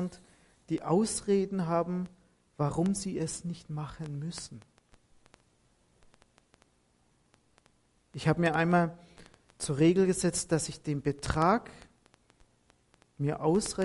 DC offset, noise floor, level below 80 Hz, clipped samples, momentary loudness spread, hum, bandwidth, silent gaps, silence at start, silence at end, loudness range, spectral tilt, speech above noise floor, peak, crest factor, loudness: under 0.1%; -69 dBFS; -56 dBFS; under 0.1%; 13 LU; none; 11.5 kHz; none; 0 s; 0 s; 13 LU; -5.5 dB/octave; 40 dB; -12 dBFS; 20 dB; -30 LUFS